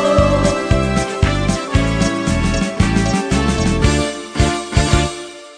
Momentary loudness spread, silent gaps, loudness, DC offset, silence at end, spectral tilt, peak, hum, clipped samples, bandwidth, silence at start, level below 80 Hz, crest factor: 4 LU; none; -16 LUFS; under 0.1%; 0 s; -5.5 dB/octave; 0 dBFS; none; under 0.1%; 10 kHz; 0 s; -22 dBFS; 16 dB